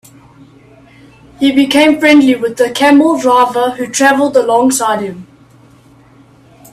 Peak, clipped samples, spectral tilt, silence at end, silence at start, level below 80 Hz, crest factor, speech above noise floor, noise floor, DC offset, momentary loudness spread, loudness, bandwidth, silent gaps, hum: 0 dBFS; under 0.1%; -3 dB/octave; 1.5 s; 1.4 s; -52 dBFS; 12 dB; 33 dB; -43 dBFS; under 0.1%; 8 LU; -10 LUFS; 14 kHz; none; none